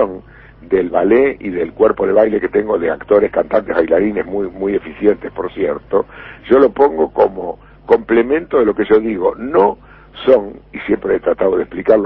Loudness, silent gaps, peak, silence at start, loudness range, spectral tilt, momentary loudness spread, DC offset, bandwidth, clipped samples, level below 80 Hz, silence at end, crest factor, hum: -15 LUFS; none; 0 dBFS; 0 s; 2 LU; -9.5 dB/octave; 9 LU; under 0.1%; 4.5 kHz; under 0.1%; -44 dBFS; 0 s; 14 dB; none